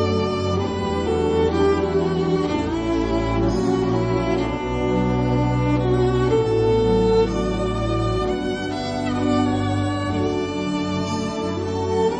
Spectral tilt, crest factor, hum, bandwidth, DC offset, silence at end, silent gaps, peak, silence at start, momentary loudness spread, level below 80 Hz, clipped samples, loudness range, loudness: -7 dB/octave; 14 dB; none; 9.6 kHz; under 0.1%; 0 s; none; -8 dBFS; 0 s; 5 LU; -34 dBFS; under 0.1%; 3 LU; -21 LUFS